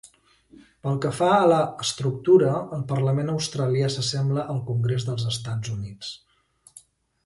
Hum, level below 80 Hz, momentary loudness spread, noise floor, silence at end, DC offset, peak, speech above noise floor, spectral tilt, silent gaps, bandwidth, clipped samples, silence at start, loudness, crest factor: none; -58 dBFS; 14 LU; -59 dBFS; 1.1 s; under 0.1%; -6 dBFS; 36 dB; -6 dB/octave; none; 11.5 kHz; under 0.1%; 0.85 s; -24 LUFS; 18 dB